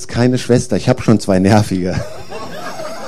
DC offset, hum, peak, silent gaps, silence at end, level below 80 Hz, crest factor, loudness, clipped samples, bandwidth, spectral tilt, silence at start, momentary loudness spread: 4%; none; 0 dBFS; none; 0 s; -42 dBFS; 16 dB; -14 LUFS; under 0.1%; 14 kHz; -6.5 dB/octave; 0 s; 16 LU